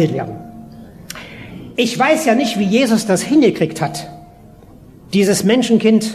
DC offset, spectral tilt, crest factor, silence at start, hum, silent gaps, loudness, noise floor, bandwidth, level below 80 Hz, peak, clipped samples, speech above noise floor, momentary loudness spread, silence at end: under 0.1%; -5 dB/octave; 16 dB; 0 s; none; none; -15 LUFS; -41 dBFS; 14.5 kHz; -50 dBFS; -2 dBFS; under 0.1%; 27 dB; 20 LU; 0 s